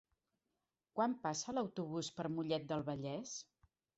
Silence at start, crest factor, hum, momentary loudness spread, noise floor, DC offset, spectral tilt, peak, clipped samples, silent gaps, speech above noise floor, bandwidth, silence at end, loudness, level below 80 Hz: 0.95 s; 20 dB; none; 8 LU; -89 dBFS; under 0.1%; -5 dB/octave; -22 dBFS; under 0.1%; none; 49 dB; 8 kHz; 0.55 s; -41 LUFS; -78 dBFS